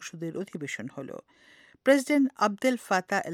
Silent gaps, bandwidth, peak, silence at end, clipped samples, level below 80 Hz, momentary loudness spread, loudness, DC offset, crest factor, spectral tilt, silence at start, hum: none; 16 kHz; -8 dBFS; 0 s; under 0.1%; -78 dBFS; 17 LU; -27 LUFS; under 0.1%; 20 dB; -4.5 dB/octave; 0 s; none